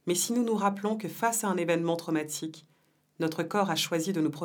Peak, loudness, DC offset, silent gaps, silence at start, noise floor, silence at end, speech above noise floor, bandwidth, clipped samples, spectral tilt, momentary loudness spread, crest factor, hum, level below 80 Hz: -12 dBFS; -29 LUFS; under 0.1%; none; 0.05 s; -68 dBFS; 0 s; 39 dB; over 20 kHz; under 0.1%; -4 dB/octave; 6 LU; 18 dB; none; -84 dBFS